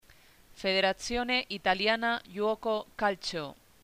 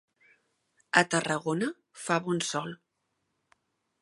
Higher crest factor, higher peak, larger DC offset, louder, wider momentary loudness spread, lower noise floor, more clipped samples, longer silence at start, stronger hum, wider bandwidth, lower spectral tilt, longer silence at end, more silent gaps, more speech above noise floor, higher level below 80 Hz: second, 20 dB vs 28 dB; second, -12 dBFS vs -4 dBFS; neither; about the same, -30 LUFS vs -29 LUFS; second, 8 LU vs 16 LU; second, -59 dBFS vs -80 dBFS; neither; second, 0.55 s vs 0.95 s; neither; first, 15.5 kHz vs 11.5 kHz; about the same, -3.5 dB/octave vs -3.5 dB/octave; second, 0.3 s vs 1.25 s; neither; second, 28 dB vs 51 dB; first, -56 dBFS vs -78 dBFS